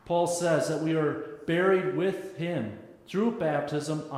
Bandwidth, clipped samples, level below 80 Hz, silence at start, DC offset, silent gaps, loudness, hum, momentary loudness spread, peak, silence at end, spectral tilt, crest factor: 15 kHz; under 0.1%; -68 dBFS; 0.05 s; under 0.1%; none; -28 LUFS; none; 10 LU; -12 dBFS; 0 s; -5.5 dB/octave; 16 dB